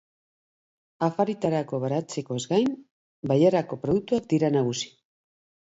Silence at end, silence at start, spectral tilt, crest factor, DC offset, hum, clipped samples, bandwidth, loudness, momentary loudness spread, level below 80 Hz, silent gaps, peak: 0.75 s; 1 s; -6.5 dB/octave; 18 dB; under 0.1%; none; under 0.1%; 8 kHz; -25 LUFS; 10 LU; -62 dBFS; 2.91-3.23 s; -8 dBFS